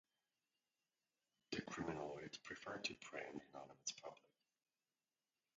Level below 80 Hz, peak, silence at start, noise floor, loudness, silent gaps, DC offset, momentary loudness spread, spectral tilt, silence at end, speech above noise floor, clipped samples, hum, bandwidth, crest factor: -80 dBFS; -28 dBFS; 1.5 s; under -90 dBFS; -50 LUFS; none; under 0.1%; 10 LU; -3 dB/octave; 1.4 s; over 37 dB; under 0.1%; none; 9 kHz; 26 dB